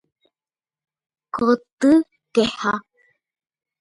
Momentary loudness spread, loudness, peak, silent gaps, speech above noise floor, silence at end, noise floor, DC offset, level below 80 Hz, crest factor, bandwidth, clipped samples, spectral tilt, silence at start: 9 LU; -20 LUFS; -6 dBFS; 1.73-1.77 s; over 72 dB; 1 s; under -90 dBFS; under 0.1%; -58 dBFS; 18 dB; 11.5 kHz; under 0.1%; -5 dB/octave; 1.35 s